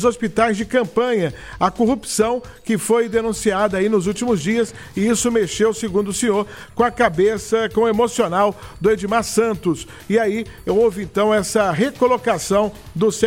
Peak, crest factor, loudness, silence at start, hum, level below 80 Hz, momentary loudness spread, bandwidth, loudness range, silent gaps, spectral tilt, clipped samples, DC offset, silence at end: -2 dBFS; 18 dB; -19 LUFS; 0 s; none; -44 dBFS; 5 LU; 16.5 kHz; 1 LU; none; -4.5 dB/octave; under 0.1%; 0.2%; 0 s